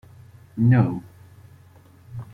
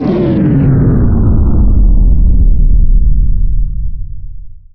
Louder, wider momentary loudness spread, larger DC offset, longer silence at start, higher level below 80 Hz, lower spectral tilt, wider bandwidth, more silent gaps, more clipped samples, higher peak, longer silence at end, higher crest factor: second, -21 LUFS vs -12 LUFS; first, 21 LU vs 13 LU; second, under 0.1% vs 10%; first, 0.55 s vs 0 s; second, -56 dBFS vs -10 dBFS; about the same, -10.5 dB/octave vs -11 dB/octave; first, 4.4 kHz vs 3.3 kHz; neither; neither; second, -6 dBFS vs 0 dBFS; about the same, 0.1 s vs 0 s; first, 20 dB vs 8 dB